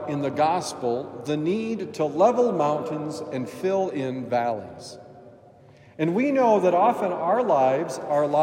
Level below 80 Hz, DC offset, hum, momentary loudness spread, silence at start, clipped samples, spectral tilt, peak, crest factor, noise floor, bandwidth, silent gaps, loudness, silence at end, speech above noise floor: -72 dBFS; under 0.1%; none; 11 LU; 0 s; under 0.1%; -6 dB/octave; -8 dBFS; 16 dB; -51 dBFS; 15.5 kHz; none; -24 LUFS; 0 s; 28 dB